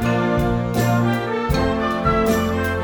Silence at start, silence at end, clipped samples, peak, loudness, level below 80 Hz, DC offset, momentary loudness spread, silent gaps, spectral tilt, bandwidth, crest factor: 0 s; 0 s; under 0.1%; -6 dBFS; -19 LUFS; -32 dBFS; under 0.1%; 3 LU; none; -6.5 dB/octave; over 20 kHz; 14 dB